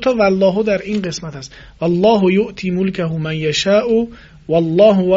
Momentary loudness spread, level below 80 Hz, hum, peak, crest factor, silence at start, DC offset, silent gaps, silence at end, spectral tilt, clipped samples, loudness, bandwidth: 15 LU; -44 dBFS; none; 0 dBFS; 16 dB; 0 s; under 0.1%; none; 0 s; -6 dB/octave; under 0.1%; -15 LUFS; 7.8 kHz